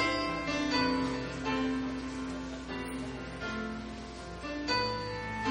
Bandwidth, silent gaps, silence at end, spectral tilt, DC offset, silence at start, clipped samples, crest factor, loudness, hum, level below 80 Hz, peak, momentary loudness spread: 10 kHz; none; 0 s; -4.5 dB/octave; under 0.1%; 0 s; under 0.1%; 16 dB; -34 LUFS; none; -50 dBFS; -18 dBFS; 10 LU